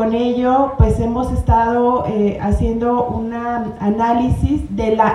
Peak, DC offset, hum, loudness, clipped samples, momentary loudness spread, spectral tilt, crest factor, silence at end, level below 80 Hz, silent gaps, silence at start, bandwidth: 0 dBFS; under 0.1%; none; -17 LUFS; under 0.1%; 6 LU; -8.5 dB/octave; 16 dB; 0 s; -26 dBFS; none; 0 s; 11.5 kHz